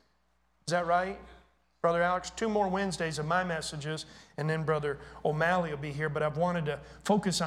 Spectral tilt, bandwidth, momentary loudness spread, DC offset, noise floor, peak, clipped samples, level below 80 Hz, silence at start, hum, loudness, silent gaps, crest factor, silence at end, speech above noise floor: -5 dB/octave; 14.5 kHz; 9 LU; under 0.1%; -73 dBFS; -14 dBFS; under 0.1%; -58 dBFS; 0.65 s; none; -31 LUFS; none; 18 dB; 0 s; 42 dB